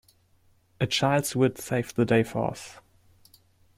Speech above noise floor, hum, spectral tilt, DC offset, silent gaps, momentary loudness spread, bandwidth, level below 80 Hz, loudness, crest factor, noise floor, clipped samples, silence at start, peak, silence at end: 38 dB; none; -5 dB/octave; under 0.1%; none; 9 LU; 16 kHz; -58 dBFS; -26 LUFS; 18 dB; -63 dBFS; under 0.1%; 0.8 s; -10 dBFS; 1.05 s